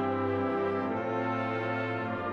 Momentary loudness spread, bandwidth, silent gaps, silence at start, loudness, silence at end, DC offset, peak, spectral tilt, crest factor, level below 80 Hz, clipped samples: 2 LU; 6.8 kHz; none; 0 s; -31 LUFS; 0 s; under 0.1%; -20 dBFS; -8 dB/octave; 12 dB; -64 dBFS; under 0.1%